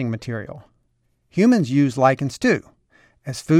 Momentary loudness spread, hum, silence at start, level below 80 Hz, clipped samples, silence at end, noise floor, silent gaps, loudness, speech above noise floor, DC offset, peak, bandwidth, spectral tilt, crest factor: 16 LU; none; 0 s; -58 dBFS; under 0.1%; 0 s; -66 dBFS; none; -20 LUFS; 47 dB; under 0.1%; -2 dBFS; 13 kHz; -6.5 dB/octave; 18 dB